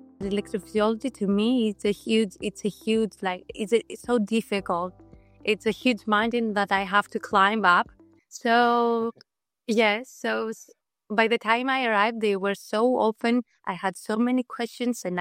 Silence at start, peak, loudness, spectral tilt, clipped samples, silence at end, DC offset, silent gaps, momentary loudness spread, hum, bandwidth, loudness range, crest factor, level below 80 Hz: 0.2 s; -4 dBFS; -25 LUFS; -5 dB/octave; under 0.1%; 0 s; under 0.1%; none; 9 LU; none; 16 kHz; 4 LU; 20 dB; -60 dBFS